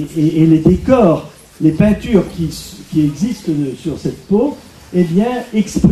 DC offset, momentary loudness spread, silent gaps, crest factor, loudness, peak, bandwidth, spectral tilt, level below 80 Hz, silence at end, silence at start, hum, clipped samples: under 0.1%; 11 LU; none; 14 dB; -15 LUFS; 0 dBFS; 13.5 kHz; -7.5 dB/octave; -34 dBFS; 0 s; 0 s; none; under 0.1%